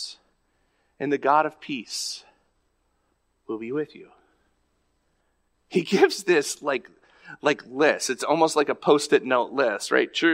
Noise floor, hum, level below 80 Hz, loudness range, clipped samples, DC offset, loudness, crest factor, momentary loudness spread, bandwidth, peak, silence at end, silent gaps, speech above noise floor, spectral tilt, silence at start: -71 dBFS; none; -74 dBFS; 13 LU; under 0.1%; under 0.1%; -24 LUFS; 20 dB; 12 LU; 16 kHz; -4 dBFS; 0 s; none; 47 dB; -3.5 dB/octave; 0 s